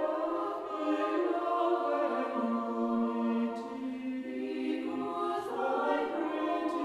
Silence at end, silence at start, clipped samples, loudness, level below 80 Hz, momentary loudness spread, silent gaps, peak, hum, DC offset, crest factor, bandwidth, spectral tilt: 0 s; 0 s; under 0.1%; -33 LUFS; -76 dBFS; 7 LU; none; -18 dBFS; none; under 0.1%; 14 dB; 12 kHz; -6 dB/octave